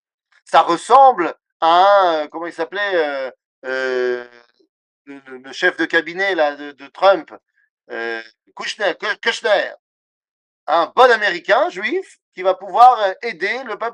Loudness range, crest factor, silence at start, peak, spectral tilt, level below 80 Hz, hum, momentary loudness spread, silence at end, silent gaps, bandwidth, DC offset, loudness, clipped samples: 7 LU; 18 dB; 0.5 s; 0 dBFS; -3 dB/octave; -70 dBFS; none; 17 LU; 0 s; 1.52-1.60 s, 3.45-3.62 s, 4.69-5.05 s, 7.70-7.77 s, 9.79-10.21 s, 10.31-10.67 s, 12.22-12.32 s; 10.5 kHz; under 0.1%; -17 LUFS; under 0.1%